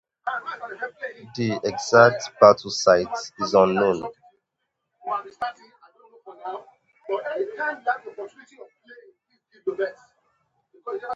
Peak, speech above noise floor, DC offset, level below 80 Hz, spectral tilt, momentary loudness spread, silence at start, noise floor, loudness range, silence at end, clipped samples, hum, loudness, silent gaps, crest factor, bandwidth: 0 dBFS; 57 dB; under 0.1%; -64 dBFS; -4.5 dB/octave; 22 LU; 0.25 s; -79 dBFS; 14 LU; 0 s; under 0.1%; none; -22 LUFS; none; 24 dB; 8 kHz